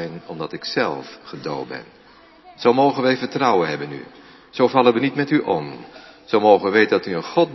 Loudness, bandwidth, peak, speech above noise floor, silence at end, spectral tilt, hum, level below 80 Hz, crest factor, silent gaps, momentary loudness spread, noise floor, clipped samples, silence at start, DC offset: -19 LUFS; 6 kHz; 0 dBFS; 29 dB; 0 s; -6.5 dB/octave; none; -64 dBFS; 20 dB; none; 18 LU; -48 dBFS; under 0.1%; 0 s; under 0.1%